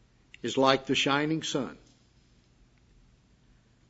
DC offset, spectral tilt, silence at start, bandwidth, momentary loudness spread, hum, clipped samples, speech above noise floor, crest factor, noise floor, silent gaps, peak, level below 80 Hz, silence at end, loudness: under 0.1%; -4 dB/octave; 0.45 s; 8 kHz; 12 LU; none; under 0.1%; 35 dB; 26 dB; -62 dBFS; none; -6 dBFS; -64 dBFS; 2.15 s; -28 LUFS